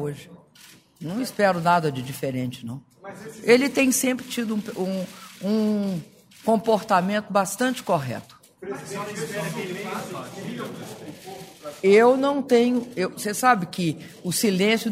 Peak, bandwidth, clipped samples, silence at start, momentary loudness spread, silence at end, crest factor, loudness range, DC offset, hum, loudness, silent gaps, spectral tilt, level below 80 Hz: -2 dBFS; 16 kHz; under 0.1%; 0 s; 19 LU; 0 s; 22 dB; 9 LU; under 0.1%; none; -23 LUFS; none; -4.5 dB/octave; -66 dBFS